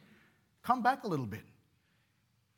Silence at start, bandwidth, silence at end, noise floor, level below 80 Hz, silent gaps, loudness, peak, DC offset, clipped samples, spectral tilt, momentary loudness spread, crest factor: 0.65 s; 18 kHz; 1.15 s; -74 dBFS; -80 dBFS; none; -33 LUFS; -14 dBFS; under 0.1%; under 0.1%; -6.5 dB/octave; 17 LU; 22 dB